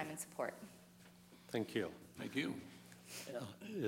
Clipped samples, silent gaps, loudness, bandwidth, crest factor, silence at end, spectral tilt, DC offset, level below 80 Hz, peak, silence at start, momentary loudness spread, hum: under 0.1%; none; -45 LUFS; 16 kHz; 20 dB; 0 s; -4.5 dB/octave; under 0.1%; -82 dBFS; -24 dBFS; 0 s; 20 LU; none